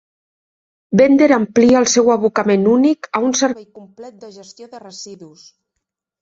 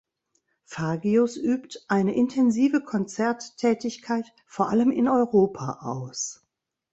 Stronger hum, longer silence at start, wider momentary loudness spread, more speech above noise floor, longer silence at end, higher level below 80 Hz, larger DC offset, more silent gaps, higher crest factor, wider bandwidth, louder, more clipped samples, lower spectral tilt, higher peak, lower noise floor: neither; first, 0.9 s vs 0.7 s; first, 21 LU vs 11 LU; first, 63 dB vs 49 dB; first, 0.95 s vs 0.6 s; first, -56 dBFS vs -66 dBFS; neither; neither; about the same, 14 dB vs 18 dB; about the same, 7.8 kHz vs 8.2 kHz; first, -14 LUFS vs -25 LUFS; neither; second, -4.5 dB/octave vs -6 dB/octave; first, -2 dBFS vs -8 dBFS; first, -78 dBFS vs -73 dBFS